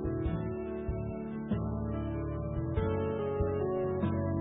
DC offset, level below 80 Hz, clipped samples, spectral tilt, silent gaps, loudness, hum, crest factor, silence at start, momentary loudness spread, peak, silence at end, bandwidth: under 0.1%; -42 dBFS; under 0.1%; -8 dB/octave; none; -34 LUFS; none; 14 dB; 0 s; 5 LU; -18 dBFS; 0 s; 3.8 kHz